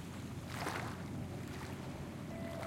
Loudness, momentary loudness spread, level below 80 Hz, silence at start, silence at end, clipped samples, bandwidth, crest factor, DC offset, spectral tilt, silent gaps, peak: -44 LUFS; 5 LU; -62 dBFS; 0 s; 0 s; under 0.1%; 16.5 kHz; 20 dB; under 0.1%; -5.5 dB/octave; none; -24 dBFS